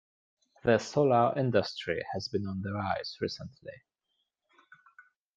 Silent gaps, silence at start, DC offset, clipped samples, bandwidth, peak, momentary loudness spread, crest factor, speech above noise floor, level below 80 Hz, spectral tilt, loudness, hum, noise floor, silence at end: none; 0.65 s; under 0.1%; under 0.1%; 9.2 kHz; -12 dBFS; 15 LU; 20 dB; 51 dB; -68 dBFS; -6 dB/octave; -30 LUFS; none; -81 dBFS; 1.6 s